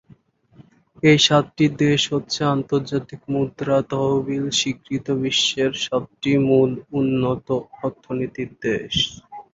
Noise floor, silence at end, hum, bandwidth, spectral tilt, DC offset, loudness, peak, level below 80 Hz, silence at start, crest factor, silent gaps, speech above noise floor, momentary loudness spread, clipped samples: -53 dBFS; 0.1 s; none; 8 kHz; -4.5 dB/octave; under 0.1%; -21 LUFS; -2 dBFS; -52 dBFS; 1.05 s; 18 dB; none; 33 dB; 11 LU; under 0.1%